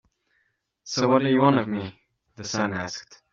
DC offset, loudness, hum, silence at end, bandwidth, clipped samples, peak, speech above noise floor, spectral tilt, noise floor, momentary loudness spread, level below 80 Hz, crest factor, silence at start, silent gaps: under 0.1%; -24 LUFS; none; 0.3 s; 7.6 kHz; under 0.1%; -6 dBFS; 49 dB; -5 dB/octave; -72 dBFS; 18 LU; -66 dBFS; 20 dB; 0.85 s; none